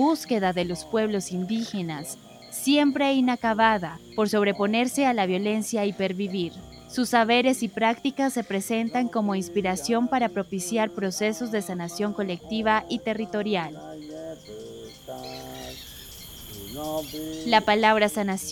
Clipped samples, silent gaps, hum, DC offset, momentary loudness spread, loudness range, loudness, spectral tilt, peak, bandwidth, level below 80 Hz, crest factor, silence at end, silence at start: under 0.1%; none; none; under 0.1%; 17 LU; 9 LU; -25 LUFS; -4.5 dB/octave; -6 dBFS; 19 kHz; -56 dBFS; 20 dB; 0 s; 0 s